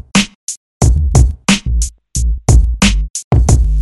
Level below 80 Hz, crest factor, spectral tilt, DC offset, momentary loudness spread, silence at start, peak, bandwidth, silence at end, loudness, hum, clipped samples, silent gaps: -14 dBFS; 12 dB; -4.5 dB/octave; under 0.1%; 9 LU; 0.15 s; 0 dBFS; 12 kHz; 0 s; -14 LUFS; none; 0.1%; 0.35-0.47 s, 0.57-0.80 s, 3.10-3.14 s, 3.24-3.31 s